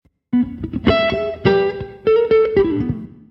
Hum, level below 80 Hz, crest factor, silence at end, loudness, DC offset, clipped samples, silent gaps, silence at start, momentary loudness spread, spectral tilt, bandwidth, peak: none; -38 dBFS; 16 dB; 0.2 s; -18 LUFS; under 0.1%; under 0.1%; none; 0.3 s; 8 LU; -8.5 dB/octave; 6 kHz; 0 dBFS